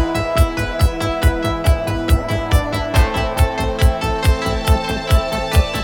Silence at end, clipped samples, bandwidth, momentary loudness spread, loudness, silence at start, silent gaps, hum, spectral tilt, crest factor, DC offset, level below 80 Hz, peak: 0 s; under 0.1%; 19 kHz; 1 LU; -18 LUFS; 0 s; none; none; -5.5 dB/octave; 14 dB; under 0.1%; -20 dBFS; -2 dBFS